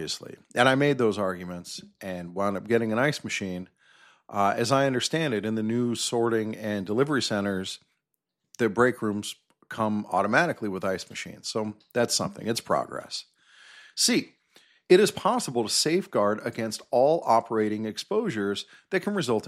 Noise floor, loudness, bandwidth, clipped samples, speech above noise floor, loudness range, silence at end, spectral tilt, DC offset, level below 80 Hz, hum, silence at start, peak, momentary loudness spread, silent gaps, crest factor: -81 dBFS; -26 LUFS; 15 kHz; under 0.1%; 55 dB; 4 LU; 0 s; -4 dB/octave; under 0.1%; -68 dBFS; none; 0 s; -6 dBFS; 13 LU; none; 20 dB